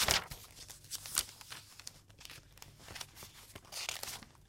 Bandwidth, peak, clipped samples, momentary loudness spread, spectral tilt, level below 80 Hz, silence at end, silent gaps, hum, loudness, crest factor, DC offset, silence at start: 17 kHz; -6 dBFS; under 0.1%; 17 LU; -0.5 dB/octave; -58 dBFS; 0 s; none; none; -40 LUFS; 36 dB; under 0.1%; 0 s